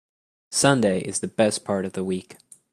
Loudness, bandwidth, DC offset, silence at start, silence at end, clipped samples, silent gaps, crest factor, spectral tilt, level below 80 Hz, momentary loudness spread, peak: -23 LUFS; 15 kHz; under 0.1%; 0.5 s; 0.4 s; under 0.1%; none; 20 dB; -4 dB/octave; -62 dBFS; 10 LU; -4 dBFS